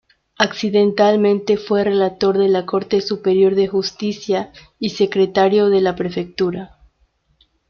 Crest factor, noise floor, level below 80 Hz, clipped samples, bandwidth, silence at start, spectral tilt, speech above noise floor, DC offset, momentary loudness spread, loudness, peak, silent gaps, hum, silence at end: 16 dB; -61 dBFS; -54 dBFS; under 0.1%; 6.8 kHz; 0.4 s; -6 dB/octave; 45 dB; under 0.1%; 9 LU; -17 LUFS; -2 dBFS; none; none; 1.05 s